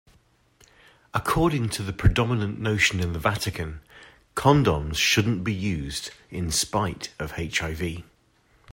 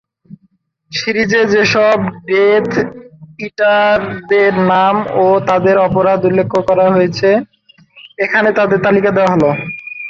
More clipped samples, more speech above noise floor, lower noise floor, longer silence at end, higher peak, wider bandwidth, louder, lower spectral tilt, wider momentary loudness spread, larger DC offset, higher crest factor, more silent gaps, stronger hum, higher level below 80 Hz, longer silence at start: neither; second, 38 dB vs 46 dB; first, -62 dBFS vs -58 dBFS; about the same, 0 s vs 0 s; second, -6 dBFS vs -2 dBFS; first, 16.5 kHz vs 7.2 kHz; second, -25 LUFS vs -12 LUFS; second, -4.5 dB/octave vs -6 dB/octave; first, 13 LU vs 7 LU; neither; first, 20 dB vs 12 dB; neither; neither; first, -40 dBFS vs -48 dBFS; first, 1.15 s vs 0.3 s